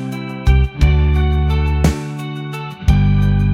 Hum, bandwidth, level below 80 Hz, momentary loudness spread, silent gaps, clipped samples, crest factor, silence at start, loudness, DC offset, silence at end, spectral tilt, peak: none; 12 kHz; -18 dBFS; 11 LU; none; under 0.1%; 14 dB; 0 s; -17 LUFS; under 0.1%; 0 s; -7.5 dB/octave; 0 dBFS